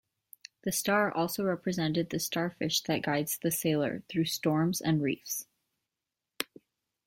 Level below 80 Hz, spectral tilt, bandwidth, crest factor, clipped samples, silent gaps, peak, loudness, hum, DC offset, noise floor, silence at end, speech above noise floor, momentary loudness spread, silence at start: -68 dBFS; -4.5 dB/octave; 16.5 kHz; 22 dB; under 0.1%; none; -10 dBFS; -31 LUFS; none; under 0.1%; -89 dBFS; 0.65 s; 58 dB; 11 LU; 0.65 s